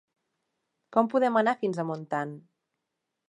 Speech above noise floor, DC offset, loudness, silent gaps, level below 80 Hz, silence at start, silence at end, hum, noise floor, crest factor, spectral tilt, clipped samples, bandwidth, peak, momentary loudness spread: 57 dB; under 0.1%; -27 LUFS; none; -84 dBFS; 0.9 s; 0.9 s; none; -84 dBFS; 22 dB; -7 dB/octave; under 0.1%; 11 kHz; -8 dBFS; 9 LU